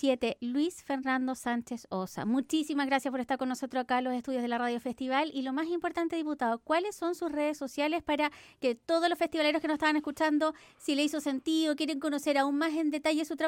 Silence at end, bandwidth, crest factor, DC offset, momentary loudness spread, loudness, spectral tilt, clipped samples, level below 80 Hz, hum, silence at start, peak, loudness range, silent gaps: 0 s; 16.5 kHz; 16 dB; under 0.1%; 5 LU; -31 LUFS; -3.5 dB/octave; under 0.1%; -68 dBFS; none; 0 s; -14 dBFS; 2 LU; none